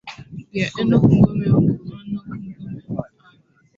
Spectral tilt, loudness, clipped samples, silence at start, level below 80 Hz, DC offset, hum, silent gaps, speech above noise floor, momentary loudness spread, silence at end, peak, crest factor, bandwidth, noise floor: -8.5 dB/octave; -19 LUFS; under 0.1%; 0.05 s; -44 dBFS; under 0.1%; none; none; 40 dB; 19 LU; 0.7 s; -2 dBFS; 18 dB; 7.6 kHz; -55 dBFS